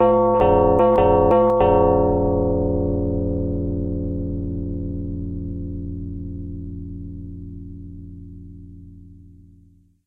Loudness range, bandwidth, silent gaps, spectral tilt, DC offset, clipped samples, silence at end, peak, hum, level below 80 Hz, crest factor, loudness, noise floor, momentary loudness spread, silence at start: 19 LU; 3.9 kHz; none; -11 dB/octave; under 0.1%; under 0.1%; 0.9 s; -4 dBFS; none; -34 dBFS; 18 dB; -20 LUFS; -53 dBFS; 22 LU; 0 s